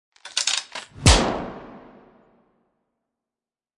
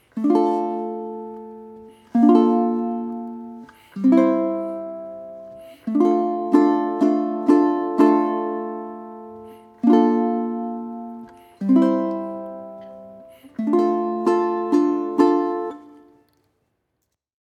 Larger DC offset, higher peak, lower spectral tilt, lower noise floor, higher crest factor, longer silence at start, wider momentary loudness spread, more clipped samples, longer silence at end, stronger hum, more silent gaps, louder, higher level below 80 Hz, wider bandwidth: neither; about the same, 0 dBFS vs -2 dBFS; second, -3 dB/octave vs -8 dB/octave; first, under -90 dBFS vs -76 dBFS; first, 26 dB vs 20 dB; about the same, 0.25 s vs 0.15 s; about the same, 19 LU vs 21 LU; neither; first, 2 s vs 1.7 s; neither; neither; about the same, -21 LUFS vs -20 LUFS; first, -32 dBFS vs -70 dBFS; first, 11.5 kHz vs 8.4 kHz